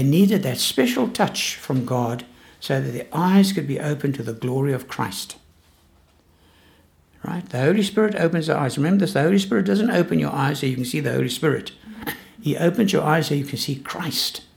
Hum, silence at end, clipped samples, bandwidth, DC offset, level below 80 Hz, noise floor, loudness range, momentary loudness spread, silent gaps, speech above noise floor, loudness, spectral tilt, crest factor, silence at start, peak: none; 0.15 s; under 0.1%; 18.5 kHz; under 0.1%; -58 dBFS; -57 dBFS; 7 LU; 12 LU; none; 36 dB; -21 LUFS; -5.5 dB/octave; 18 dB; 0 s; -4 dBFS